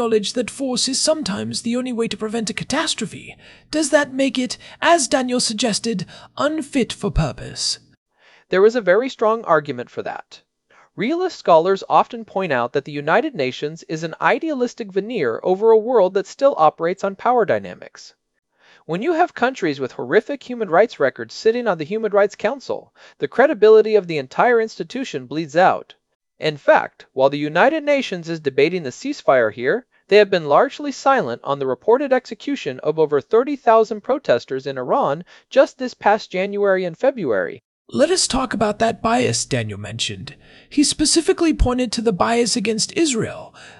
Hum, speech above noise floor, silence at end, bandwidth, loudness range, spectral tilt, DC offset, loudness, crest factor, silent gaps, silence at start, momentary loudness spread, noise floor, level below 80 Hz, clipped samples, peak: none; 36 dB; 0.1 s; 12 kHz; 4 LU; -4 dB/octave; under 0.1%; -19 LUFS; 18 dB; 7.97-8.06 s, 26.15-26.20 s, 37.64-37.85 s; 0 s; 11 LU; -55 dBFS; -42 dBFS; under 0.1%; -2 dBFS